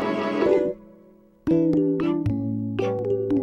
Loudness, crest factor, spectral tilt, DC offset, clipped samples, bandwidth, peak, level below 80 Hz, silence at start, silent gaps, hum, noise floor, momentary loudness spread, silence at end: -24 LUFS; 14 dB; -9 dB/octave; under 0.1%; under 0.1%; 7.4 kHz; -8 dBFS; -50 dBFS; 0 s; none; none; -53 dBFS; 7 LU; 0 s